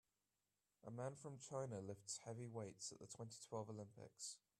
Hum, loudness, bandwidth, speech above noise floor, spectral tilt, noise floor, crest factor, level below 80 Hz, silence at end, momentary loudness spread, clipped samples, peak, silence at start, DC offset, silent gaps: none; -53 LUFS; 13.5 kHz; over 37 dB; -4.5 dB/octave; under -90 dBFS; 18 dB; -88 dBFS; 0.25 s; 6 LU; under 0.1%; -36 dBFS; 0.85 s; under 0.1%; none